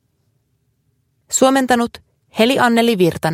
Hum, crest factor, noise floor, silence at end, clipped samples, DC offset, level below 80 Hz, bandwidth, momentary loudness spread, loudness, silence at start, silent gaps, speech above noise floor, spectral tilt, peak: none; 16 dB; -65 dBFS; 0 s; under 0.1%; under 0.1%; -54 dBFS; 16.5 kHz; 8 LU; -15 LUFS; 1.3 s; none; 50 dB; -4 dB/octave; 0 dBFS